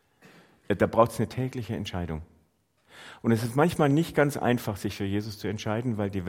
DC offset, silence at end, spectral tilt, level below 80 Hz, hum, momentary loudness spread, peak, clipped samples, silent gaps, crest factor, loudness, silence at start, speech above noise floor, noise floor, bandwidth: under 0.1%; 0 s; -6.5 dB/octave; -56 dBFS; none; 11 LU; -6 dBFS; under 0.1%; none; 22 dB; -27 LUFS; 0.7 s; 41 dB; -68 dBFS; 16.5 kHz